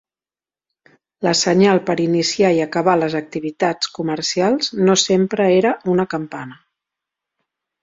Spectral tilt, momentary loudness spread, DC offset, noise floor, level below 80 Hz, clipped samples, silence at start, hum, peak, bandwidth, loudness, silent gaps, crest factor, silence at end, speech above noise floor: -4.5 dB/octave; 10 LU; under 0.1%; under -90 dBFS; -60 dBFS; under 0.1%; 1.2 s; none; 0 dBFS; 7.8 kHz; -17 LUFS; none; 18 dB; 1.3 s; over 73 dB